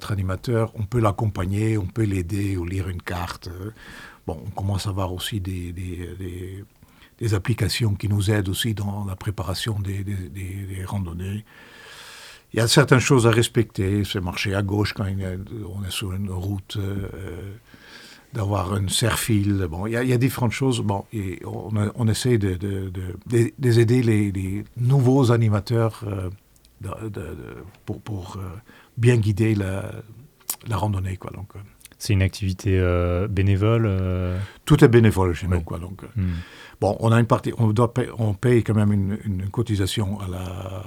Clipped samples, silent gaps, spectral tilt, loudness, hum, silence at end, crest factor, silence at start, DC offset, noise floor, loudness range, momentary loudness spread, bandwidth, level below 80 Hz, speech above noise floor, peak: under 0.1%; none; -6 dB/octave; -23 LUFS; none; 0 s; 22 dB; 0 s; under 0.1%; -43 dBFS; 9 LU; 16 LU; 16.5 kHz; -48 dBFS; 21 dB; 0 dBFS